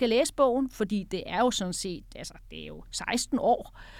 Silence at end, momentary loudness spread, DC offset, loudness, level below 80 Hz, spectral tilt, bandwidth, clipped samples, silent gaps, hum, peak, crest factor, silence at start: 0 s; 17 LU; under 0.1%; -28 LUFS; -50 dBFS; -4 dB/octave; 16.5 kHz; under 0.1%; none; none; -12 dBFS; 18 dB; 0 s